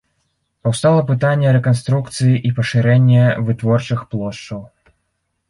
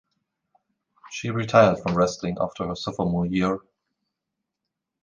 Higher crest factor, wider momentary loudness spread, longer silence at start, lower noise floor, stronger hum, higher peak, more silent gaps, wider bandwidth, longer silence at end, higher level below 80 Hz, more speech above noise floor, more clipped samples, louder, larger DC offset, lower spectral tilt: second, 14 dB vs 24 dB; about the same, 12 LU vs 13 LU; second, 0.65 s vs 1.05 s; second, -70 dBFS vs -84 dBFS; neither; about the same, -2 dBFS vs -2 dBFS; neither; first, 11.5 kHz vs 9.4 kHz; second, 0.85 s vs 1.45 s; about the same, -50 dBFS vs -52 dBFS; second, 56 dB vs 61 dB; neither; first, -16 LUFS vs -23 LUFS; neither; about the same, -7 dB/octave vs -6 dB/octave